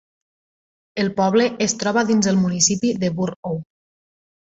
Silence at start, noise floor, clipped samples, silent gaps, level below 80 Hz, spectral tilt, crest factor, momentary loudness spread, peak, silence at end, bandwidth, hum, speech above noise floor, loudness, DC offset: 0.95 s; under -90 dBFS; under 0.1%; 3.36-3.43 s; -58 dBFS; -4 dB/octave; 18 dB; 12 LU; -4 dBFS; 0.85 s; 8.2 kHz; none; over 71 dB; -19 LUFS; under 0.1%